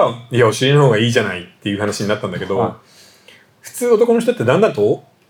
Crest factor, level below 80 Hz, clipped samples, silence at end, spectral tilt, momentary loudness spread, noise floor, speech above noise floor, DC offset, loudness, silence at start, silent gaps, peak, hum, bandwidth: 14 dB; -66 dBFS; under 0.1%; 0.3 s; -5.5 dB/octave; 10 LU; -47 dBFS; 32 dB; under 0.1%; -16 LUFS; 0 s; none; -2 dBFS; none; 18.5 kHz